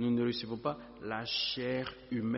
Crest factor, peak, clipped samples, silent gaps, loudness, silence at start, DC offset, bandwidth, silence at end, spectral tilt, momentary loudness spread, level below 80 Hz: 16 dB; -20 dBFS; under 0.1%; none; -35 LUFS; 0 s; under 0.1%; 6 kHz; 0 s; -3.5 dB/octave; 7 LU; -64 dBFS